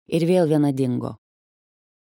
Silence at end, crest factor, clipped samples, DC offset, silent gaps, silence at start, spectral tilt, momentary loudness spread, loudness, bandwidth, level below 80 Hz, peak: 1.05 s; 16 dB; under 0.1%; under 0.1%; none; 0.1 s; -8 dB/octave; 10 LU; -21 LUFS; 17 kHz; -66 dBFS; -6 dBFS